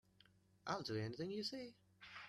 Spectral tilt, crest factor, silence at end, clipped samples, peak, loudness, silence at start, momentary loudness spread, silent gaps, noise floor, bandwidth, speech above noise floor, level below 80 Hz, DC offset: -5 dB/octave; 22 dB; 0 s; under 0.1%; -28 dBFS; -46 LUFS; 0.65 s; 13 LU; none; -73 dBFS; 13 kHz; 27 dB; -80 dBFS; under 0.1%